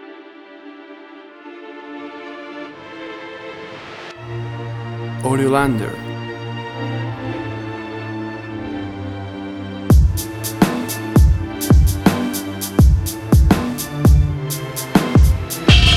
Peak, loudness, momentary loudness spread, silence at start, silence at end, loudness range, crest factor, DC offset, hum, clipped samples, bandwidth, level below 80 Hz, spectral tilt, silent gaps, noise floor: 0 dBFS; -18 LUFS; 20 LU; 0 s; 0 s; 17 LU; 18 dB; under 0.1%; none; under 0.1%; 15.5 kHz; -22 dBFS; -5.5 dB/octave; none; -39 dBFS